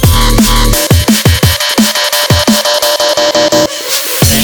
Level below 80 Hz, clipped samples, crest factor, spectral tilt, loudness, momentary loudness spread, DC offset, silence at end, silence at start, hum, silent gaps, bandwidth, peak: -18 dBFS; 0.5%; 8 dB; -3.5 dB/octave; -8 LUFS; 2 LU; under 0.1%; 0 s; 0 s; none; none; over 20 kHz; 0 dBFS